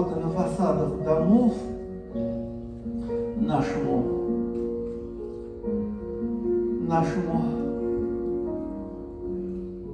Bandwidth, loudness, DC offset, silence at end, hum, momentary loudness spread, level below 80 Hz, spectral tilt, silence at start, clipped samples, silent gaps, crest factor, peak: 9.8 kHz; -28 LUFS; under 0.1%; 0 s; none; 11 LU; -44 dBFS; -9 dB/octave; 0 s; under 0.1%; none; 18 dB; -8 dBFS